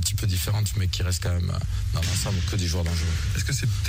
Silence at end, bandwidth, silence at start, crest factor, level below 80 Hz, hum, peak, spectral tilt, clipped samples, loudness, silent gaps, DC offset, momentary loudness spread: 0 s; 16 kHz; 0 s; 12 dB; -32 dBFS; none; -12 dBFS; -4 dB/octave; under 0.1%; -26 LUFS; none; under 0.1%; 2 LU